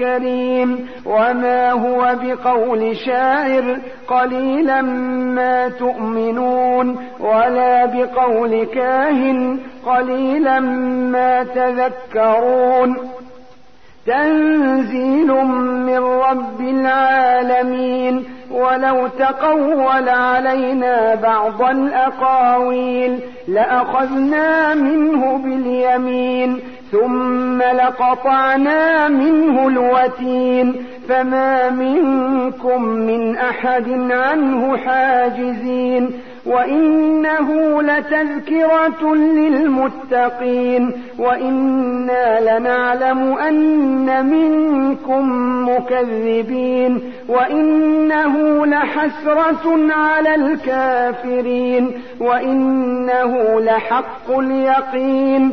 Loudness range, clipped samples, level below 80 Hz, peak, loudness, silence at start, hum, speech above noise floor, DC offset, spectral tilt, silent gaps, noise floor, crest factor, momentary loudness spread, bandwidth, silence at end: 2 LU; under 0.1%; -56 dBFS; -4 dBFS; -16 LUFS; 0 s; none; 33 dB; 0.9%; -7 dB/octave; none; -48 dBFS; 12 dB; 5 LU; 6 kHz; 0 s